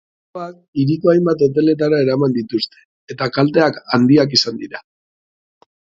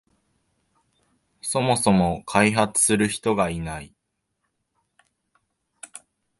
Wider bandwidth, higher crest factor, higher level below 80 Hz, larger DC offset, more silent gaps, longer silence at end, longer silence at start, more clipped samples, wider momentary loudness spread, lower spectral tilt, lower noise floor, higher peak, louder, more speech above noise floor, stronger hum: second, 7.8 kHz vs 12 kHz; about the same, 18 dB vs 22 dB; second, -58 dBFS vs -50 dBFS; neither; first, 0.68-0.73 s, 2.85-3.08 s vs none; first, 1.15 s vs 0.4 s; second, 0.35 s vs 1.45 s; neither; second, 18 LU vs 22 LU; first, -6 dB/octave vs -4 dB/octave; first, under -90 dBFS vs -78 dBFS; first, 0 dBFS vs -4 dBFS; first, -16 LUFS vs -21 LUFS; first, over 74 dB vs 57 dB; neither